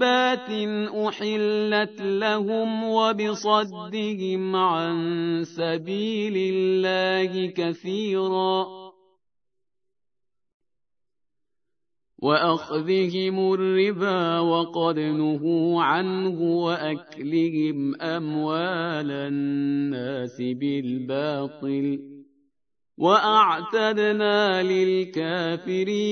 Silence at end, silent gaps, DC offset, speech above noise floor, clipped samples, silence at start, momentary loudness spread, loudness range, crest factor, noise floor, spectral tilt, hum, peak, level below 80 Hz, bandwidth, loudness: 0 s; 10.54-10.60 s; under 0.1%; 64 dB; under 0.1%; 0 s; 7 LU; 7 LU; 20 dB; -87 dBFS; -6 dB/octave; none; -6 dBFS; -80 dBFS; 6.6 kHz; -24 LUFS